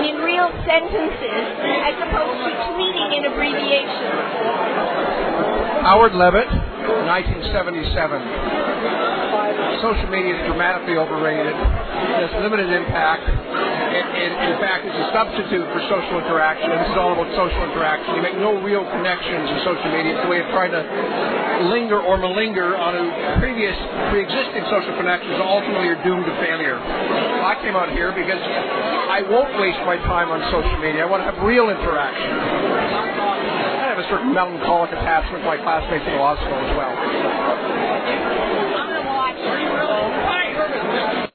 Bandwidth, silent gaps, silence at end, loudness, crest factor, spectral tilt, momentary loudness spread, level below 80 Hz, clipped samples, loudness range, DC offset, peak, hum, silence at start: 4.6 kHz; none; 0.05 s; -19 LUFS; 18 dB; -8.5 dB/octave; 4 LU; -34 dBFS; under 0.1%; 3 LU; under 0.1%; -2 dBFS; none; 0 s